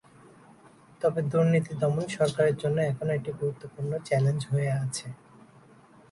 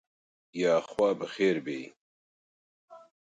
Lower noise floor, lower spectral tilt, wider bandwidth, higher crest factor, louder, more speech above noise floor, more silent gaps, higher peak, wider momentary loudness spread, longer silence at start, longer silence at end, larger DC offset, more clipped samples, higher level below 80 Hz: second, -55 dBFS vs under -90 dBFS; about the same, -6.5 dB/octave vs -5.5 dB/octave; about the same, 11.5 kHz vs 11 kHz; about the same, 16 dB vs 18 dB; about the same, -28 LUFS vs -29 LUFS; second, 28 dB vs over 62 dB; second, none vs 1.97-2.88 s; about the same, -12 dBFS vs -14 dBFS; second, 9 LU vs 14 LU; first, 1 s vs 0.55 s; first, 0.95 s vs 0.25 s; neither; neither; first, -64 dBFS vs -74 dBFS